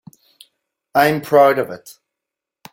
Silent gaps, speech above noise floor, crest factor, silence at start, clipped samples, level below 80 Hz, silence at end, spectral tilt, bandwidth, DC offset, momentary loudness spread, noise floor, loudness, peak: none; 69 dB; 18 dB; 0.95 s; under 0.1%; -62 dBFS; 0.8 s; -5.5 dB/octave; 17 kHz; under 0.1%; 14 LU; -84 dBFS; -16 LUFS; -2 dBFS